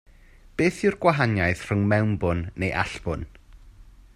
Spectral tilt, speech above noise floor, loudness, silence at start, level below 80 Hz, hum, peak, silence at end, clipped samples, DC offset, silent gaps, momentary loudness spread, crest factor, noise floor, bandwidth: -7 dB/octave; 27 dB; -24 LUFS; 0.6 s; -46 dBFS; none; -6 dBFS; 0.3 s; under 0.1%; under 0.1%; none; 11 LU; 20 dB; -51 dBFS; 12 kHz